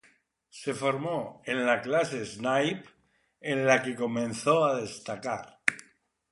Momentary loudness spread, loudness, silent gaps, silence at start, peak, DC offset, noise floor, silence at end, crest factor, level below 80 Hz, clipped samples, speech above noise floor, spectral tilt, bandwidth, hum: 12 LU; -29 LUFS; none; 0.55 s; -4 dBFS; under 0.1%; -65 dBFS; 0.5 s; 26 dB; -72 dBFS; under 0.1%; 37 dB; -4.5 dB/octave; 11.5 kHz; none